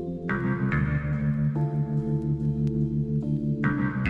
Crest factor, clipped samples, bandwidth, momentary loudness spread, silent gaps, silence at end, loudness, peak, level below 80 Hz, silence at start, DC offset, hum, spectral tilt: 14 dB; under 0.1%; 4.1 kHz; 2 LU; none; 0 s; -27 LUFS; -12 dBFS; -42 dBFS; 0 s; under 0.1%; none; -10 dB/octave